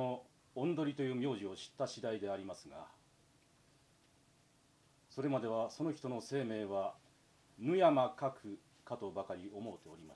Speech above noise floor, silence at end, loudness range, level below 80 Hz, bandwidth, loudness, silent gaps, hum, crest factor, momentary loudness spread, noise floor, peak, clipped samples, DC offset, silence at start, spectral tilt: 32 dB; 0 s; 10 LU; -80 dBFS; 11 kHz; -39 LUFS; none; none; 22 dB; 17 LU; -70 dBFS; -18 dBFS; under 0.1%; under 0.1%; 0 s; -6.5 dB/octave